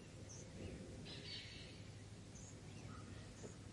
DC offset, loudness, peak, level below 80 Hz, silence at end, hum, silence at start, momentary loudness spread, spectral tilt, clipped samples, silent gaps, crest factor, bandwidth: under 0.1%; -54 LUFS; -40 dBFS; -66 dBFS; 0 s; none; 0 s; 6 LU; -4.5 dB/octave; under 0.1%; none; 14 dB; 11.5 kHz